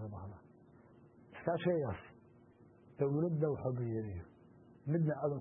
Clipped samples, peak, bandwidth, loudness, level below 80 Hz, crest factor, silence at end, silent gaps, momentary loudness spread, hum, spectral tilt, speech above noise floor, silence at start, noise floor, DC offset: under 0.1%; -20 dBFS; 3.2 kHz; -37 LUFS; -66 dBFS; 18 dB; 0 s; none; 20 LU; none; -7.5 dB/octave; 27 dB; 0 s; -63 dBFS; under 0.1%